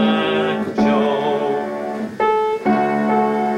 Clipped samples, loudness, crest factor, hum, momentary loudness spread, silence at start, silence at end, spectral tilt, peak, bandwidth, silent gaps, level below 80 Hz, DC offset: under 0.1%; -18 LUFS; 14 dB; none; 6 LU; 0 s; 0 s; -6.5 dB/octave; -4 dBFS; 10.5 kHz; none; -56 dBFS; under 0.1%